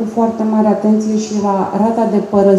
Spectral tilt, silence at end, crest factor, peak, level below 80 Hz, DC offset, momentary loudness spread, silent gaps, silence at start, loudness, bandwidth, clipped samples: -7.5 dB/octave; 0 s; 12 dB; 0 dBFS; -54 dBFS; under 0.1%; 4 LU; none; 0 s; -14 LUFS; 8.4 kHz; under 0.1%